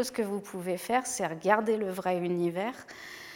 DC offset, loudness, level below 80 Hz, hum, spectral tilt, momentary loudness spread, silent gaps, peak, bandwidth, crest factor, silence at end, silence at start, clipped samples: under 0.1%; -30 LUFS; -70 dBFS; none; -4.5 dB/octave; 11 LU; none; -8 dBFS; 17 kHz; 22 dB; 0 s; 0 s; under 0.1%